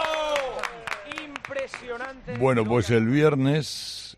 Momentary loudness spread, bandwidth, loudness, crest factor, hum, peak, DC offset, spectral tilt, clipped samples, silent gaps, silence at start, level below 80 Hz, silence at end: 14 LU; 14 kHz; -25 LUFS; 18 dB; none; -8 dBFS; under 0.1%; -6 dB/octave; under 0.1%; none; 0 s; -54 dBFS; 0.05 s